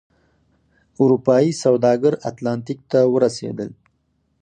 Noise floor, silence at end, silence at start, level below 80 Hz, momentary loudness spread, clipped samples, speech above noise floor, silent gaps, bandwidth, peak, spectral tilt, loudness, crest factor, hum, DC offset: -67 dBFS; 0.7 s; 1 s; -62 dBFS; 12 LU; under 0.1%; 49 dB; none; 10 kHz; -2 dBFS; -6.5 dB/octave; -18 LUFS; 18 dB; none; under 0.1%